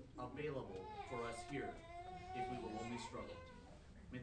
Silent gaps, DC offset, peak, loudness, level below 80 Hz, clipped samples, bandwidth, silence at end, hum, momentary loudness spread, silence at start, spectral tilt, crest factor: none; under 0.1%; -34 dBFS; -49 LUFS; -64 dBFS; under 0.1%; 10 kHz; 0 s; none; 11 LU; 0 s; -5.5 dB/octave; 16 dB